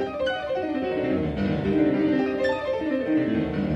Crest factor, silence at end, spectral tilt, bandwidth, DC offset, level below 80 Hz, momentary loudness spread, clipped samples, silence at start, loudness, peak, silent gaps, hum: 14 dB; 0 s; -8 dB/octave; 7.8 kHz; under 0.1%; -46 dBFS; 5 LU; under 0.1%; 0 s; -25 LUFS; -10 dBFS; none; none